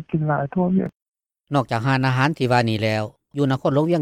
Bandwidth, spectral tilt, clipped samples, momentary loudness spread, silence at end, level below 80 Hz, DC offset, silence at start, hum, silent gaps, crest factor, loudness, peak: 12.5 kHz; -7 dB/octave; under 0.1%; 6 LU; 0 s; -56 dBFS; under 0.1%; 0 s; none; 0.96-1.00 s, 1.08-1.12 s; 14 dB; -21 LUFS; -6 dBFS